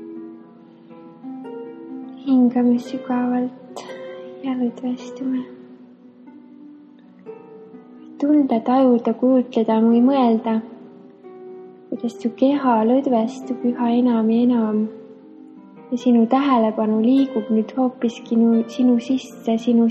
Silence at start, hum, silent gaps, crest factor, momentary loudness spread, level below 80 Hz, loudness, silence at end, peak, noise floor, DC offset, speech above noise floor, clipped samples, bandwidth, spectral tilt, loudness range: 0 s; none; none; 16 dB; 20 LU; -74 dBFS; -19 LUFS; 0 s; -4 dBFS; -46 dBFS; under 0.1%; 28 dB; under 0.1%; 7.8 kHz; -7.5 dB/octave; 11 LU